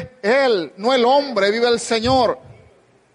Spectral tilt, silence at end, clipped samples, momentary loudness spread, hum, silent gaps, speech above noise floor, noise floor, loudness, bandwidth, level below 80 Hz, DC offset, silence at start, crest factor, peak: -4 dB/octave; 0.75 s; under 0.1%; 5 LU; none; none; 36 dB; -53 dBFS; -17 LUFS; 11.5 kHz; -50 dBFS; under 0.1%; 0 s; 12 dB; -6 dBFS